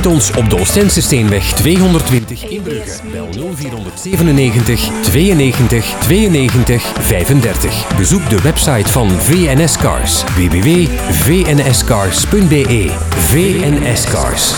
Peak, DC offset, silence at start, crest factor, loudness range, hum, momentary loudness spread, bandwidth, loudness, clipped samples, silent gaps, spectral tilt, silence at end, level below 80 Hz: 0 dBFS; under 0.1%; 0 s; 10 dB; 3 LU; none; 11 LU; 19.5 kHz; -11 LUFS; under 0.1%; none; -4.5 dB/octave; 0 s; -22 dBFS